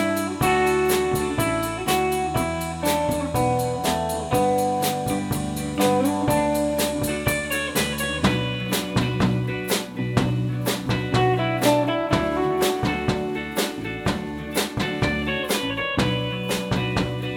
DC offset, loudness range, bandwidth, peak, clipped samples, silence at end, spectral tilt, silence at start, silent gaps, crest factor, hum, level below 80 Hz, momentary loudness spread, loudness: under 0.1%; 2 LU; 18 kHz; -6 dBFS; under 0.1%; 0 s; -5 dB/octave; 0 s; none; 18 dB; none; -42 dBFS; 5 LU; -23 LUFS